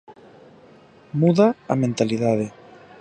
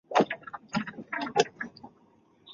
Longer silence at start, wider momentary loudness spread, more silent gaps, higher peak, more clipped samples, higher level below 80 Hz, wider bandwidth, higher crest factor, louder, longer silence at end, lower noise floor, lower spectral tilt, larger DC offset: about the same, 0.1 s vs 0.1 s; second, 11 LU vs 14 LU; neither; first, -4 dBFS vs -8 dBFS; neither; first, -62 dBFS vs -70 dBFS; first, 9.6 kHz vs 7.8 kHz; about the same, 20 dB vs 24 dB; first, -21 LUFS vs -31 LUFS; first, 0.5 s vs 0 s; second, -49 dBFS vs -63 dBFS; first, -7.5 dB/octave vs -4 dB/octave; neither